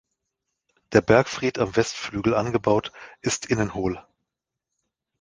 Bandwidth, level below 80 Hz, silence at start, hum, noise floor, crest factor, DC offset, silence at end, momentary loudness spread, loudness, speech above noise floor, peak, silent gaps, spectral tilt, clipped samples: 10 kHz; -50 dBFS; 0.9 s; none; -84 dBFS; 24 dB; under 0.1%; 1.2 s; 10 LU; -23 LUFS; 62 dB; -2 dBFS; none; -5 dB/octave; under 0.1%